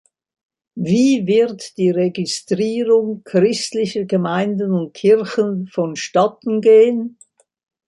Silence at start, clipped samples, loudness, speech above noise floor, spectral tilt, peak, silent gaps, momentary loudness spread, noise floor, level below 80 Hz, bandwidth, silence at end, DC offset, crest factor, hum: 0.75 s; under 0.1%; -17 LUFS; 37 dB; -6 dB/octave; -2 dBFS; none; 9 LU; -53 dBFS; -64 dBFS; 11.5 kHz; 0.8 s; under 0.1%; 14 dB; none